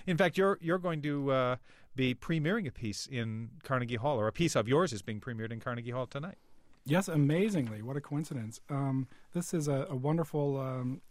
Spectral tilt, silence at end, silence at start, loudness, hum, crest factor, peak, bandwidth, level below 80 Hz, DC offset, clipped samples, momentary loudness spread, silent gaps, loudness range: -6 dB/octave; 0.05 s; 0 s; -33 LUFS; none; 18 dB; -16 dBFS; 15.5 kHz; -60 dBFS; under 0.1%; under 0.1%; 11 LU; none; 2 LU